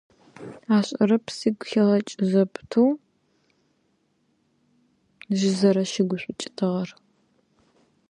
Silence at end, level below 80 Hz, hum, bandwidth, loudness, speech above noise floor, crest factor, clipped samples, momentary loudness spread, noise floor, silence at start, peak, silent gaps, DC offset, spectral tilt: 1.2 s; -70 dBFS; none; 10.5 kHz; -23 LUFS; 46 dB; 18 dB; under 0.1%; 13 LU; -69 dBFS; 0.4 s; -6 dBFS; none; under 0.1%; -6 dB/octave